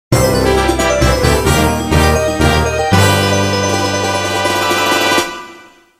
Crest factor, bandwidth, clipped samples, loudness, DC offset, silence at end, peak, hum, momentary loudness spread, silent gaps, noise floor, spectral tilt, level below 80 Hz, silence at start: 12 dB; 16 kHz; under 0.1%; -12 LUFS; under 0.1%; 0.35 s; 0 dBFS; none; 4 LU; none; -39 dBFS; -4.5 dB/octave; -24 dBFS; 0.1 s